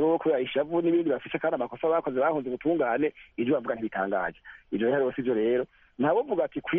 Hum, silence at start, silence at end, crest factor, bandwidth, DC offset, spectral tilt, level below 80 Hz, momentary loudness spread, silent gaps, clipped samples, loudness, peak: none; 0 s; 0 s; 12 dB; 3.8 kHz; under 0.1%; -5 dB/octave; -64 dBFS; 5 LU; none; under 0.1%; -27 LUFS; -14 dBFS